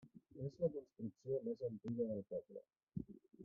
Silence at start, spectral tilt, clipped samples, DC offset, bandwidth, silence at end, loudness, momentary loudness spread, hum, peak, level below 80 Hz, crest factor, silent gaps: 0 s; -11.5 dB/octave; under 0.1%; under 0.1%; 7 kHz; 0 s; -46 LUFS; 14 LU; none; -28 dBFS; -76 dBFS; 18 dB; 2.83-2.87 s